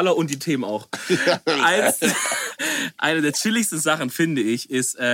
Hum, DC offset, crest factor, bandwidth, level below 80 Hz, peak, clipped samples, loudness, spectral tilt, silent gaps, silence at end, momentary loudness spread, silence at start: none; under 0.1%; 16 dB; 17 kHz; -70 dBFS; -4 dBFS; under 0.1%; -21 LUFS; -3 dB/octave; none; 0 s; 6 LU; 0 s